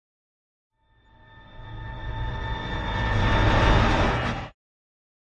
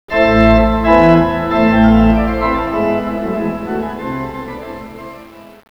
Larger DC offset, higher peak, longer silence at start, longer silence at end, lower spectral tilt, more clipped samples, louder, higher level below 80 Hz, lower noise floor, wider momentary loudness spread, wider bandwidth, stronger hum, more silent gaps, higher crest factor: second, under 0.1% vs 0.5%; second, -6 dBFS vs 0 dBFS; first, 1.35 s vs 0.1 s; first, 0.75 s vs 0.25 s; second, -6 dB/octave vs -8 dB/octave; neither; second, -24 LUFS vs -13 LUFS; about the same, -30 dBFS vs -26 dBFS; first, -58 dBFS vs -36 dBFS; about the same, 20 LU vs 19 LU; first, 8.8 kHz vs 6.8 kHz; neither; neither; first, 20 dB vs 14 dB